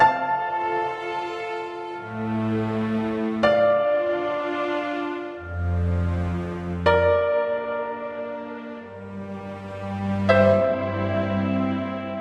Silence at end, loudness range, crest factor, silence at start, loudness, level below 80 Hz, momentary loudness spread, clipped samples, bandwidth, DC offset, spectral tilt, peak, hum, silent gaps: 0 s; 3 LU; 20 dB; 0 s; -24 LUFS; -50 dBFS; 15 LU; under 0.1%; 9 kHz; under 0.1%; -8 dB/octave; -4 dBFS; none; none